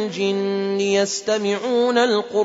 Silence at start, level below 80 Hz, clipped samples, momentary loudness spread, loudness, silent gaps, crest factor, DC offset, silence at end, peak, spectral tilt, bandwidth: 0 s; -70 dBFS; under 0.1%; 5 LU; -20 LUFS; none; 12 dB; under 0.1%; 0 s; -6 dBFS; -4 dB/octave; 8 kHz